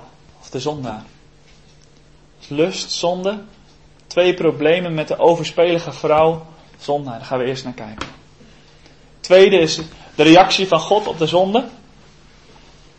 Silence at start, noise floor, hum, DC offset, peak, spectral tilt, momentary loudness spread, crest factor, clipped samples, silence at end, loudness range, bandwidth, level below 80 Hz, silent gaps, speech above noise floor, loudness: 0.5 s; -49 dBFS; none; 0.2%; 0 dBFS; -4.5 dB/octave; 20 LU; 18 dB; under 0.1%; 1.25 s; 10 LU; 8.6 kHz; -50 dBFS; none; 33 dB; -16 LUFS